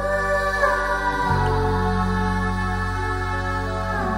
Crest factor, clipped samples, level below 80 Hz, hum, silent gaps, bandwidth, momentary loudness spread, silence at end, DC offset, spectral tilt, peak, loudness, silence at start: 16 dB; under 0.1%; -30 dBFS; none; none; 16 kHz; 5 LU; 0 s; under 0.1%; -6 dB/octave; -6 dBFS; -22 LUFS; 0 s